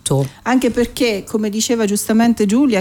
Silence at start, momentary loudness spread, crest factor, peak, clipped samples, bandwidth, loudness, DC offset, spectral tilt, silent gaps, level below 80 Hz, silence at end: 0.05 s; 5 LU; 12 dB; -4 dBFS; under 0.1%; 18 kHz; -16 LUFS; under 0.1%; -5 dB/octave; none; -44 dBFS; 0 s